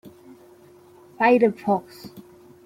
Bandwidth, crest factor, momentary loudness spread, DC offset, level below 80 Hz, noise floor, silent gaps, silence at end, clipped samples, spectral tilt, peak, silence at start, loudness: 15.5 kHz; 18 dB; 25 LU; under 0.1%; -70 dBFS; -50 dBFS; none; 0.45 s; under 0.1%; -7 dB/octave; -6 dBFS; 0.05 s; -21 LUFS